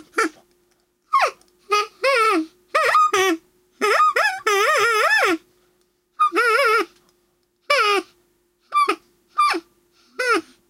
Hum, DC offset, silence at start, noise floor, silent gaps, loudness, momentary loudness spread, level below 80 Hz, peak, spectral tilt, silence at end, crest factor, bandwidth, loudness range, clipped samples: none; under 0.1%; 0.15 s; -66 dBFS; none; -19 LUFS; 9 LU; -70 dBFS; -4 dBFS; -0.5 dB/octave; 0.3 s; 18 dB; 16.5 kHz; 4 LU; under 0.1%